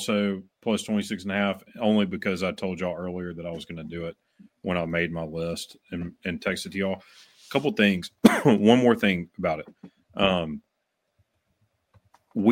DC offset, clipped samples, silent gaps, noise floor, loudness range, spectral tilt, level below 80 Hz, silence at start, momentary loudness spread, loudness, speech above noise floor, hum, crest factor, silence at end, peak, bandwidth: under 0.1%; under 0.1%; none; -78 dBFS; 9 LU; -5.5 dB/octave; -58 dBFS; 0 s; 16 LU; -26 LUFS; 52 dB; none; 26 dB; 0 s; 0 dBFS; 16.5 kHz